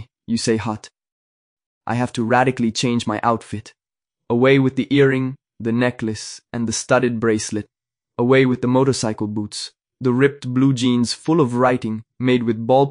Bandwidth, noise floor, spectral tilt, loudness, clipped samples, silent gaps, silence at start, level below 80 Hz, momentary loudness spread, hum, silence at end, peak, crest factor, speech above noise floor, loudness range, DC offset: 10.5 kHz; -85 dBFS; -5.5 dB/octave; -19 LUFS; under 0.1%; 1.12-1.57 s, 1.66-1.81 s; 0 s; -56 dBFS; 12 LU; none; 0 s; -2 dBFS; 18 dB; 67 dB; 3 LU; under 0.1%